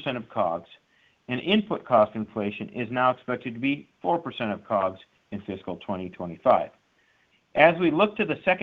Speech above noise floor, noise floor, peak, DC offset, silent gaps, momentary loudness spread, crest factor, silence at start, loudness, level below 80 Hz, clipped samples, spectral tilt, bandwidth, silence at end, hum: 40 dB; -66 dBFS; -2 dBFS; under 0.1%; none; 14 LU; 24 dB; 0 s; -26 LUFS; -64 dBFS; under 0.1%; -8 dB/octave; 5 kHz; 0 s; none